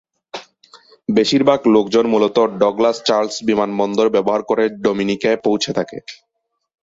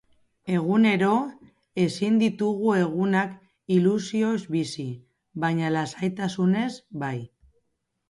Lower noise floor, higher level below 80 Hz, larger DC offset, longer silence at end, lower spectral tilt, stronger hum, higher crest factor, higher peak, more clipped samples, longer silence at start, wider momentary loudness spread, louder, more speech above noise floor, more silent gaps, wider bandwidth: second, -48 dBFS vs -76 dBFS; first, -58 dBFS vs -66 dBFS; neither; second, 0.7 s vs 0.85 s; second, -5 dB/octave vs -6.5 dB/octave; neither; about the same, 16 dB vs 16 dB; first, -2 dBFS vs -10 dBFS; neither; about the same, 0.35 s vs 0.45 s; about the same, 17 LU vs 15 LU; first, -16 LUFS vs -25 LUFS; second, 32 dB vs 53 dB; neither; second, 7.8 kHz vs 11.5 kHz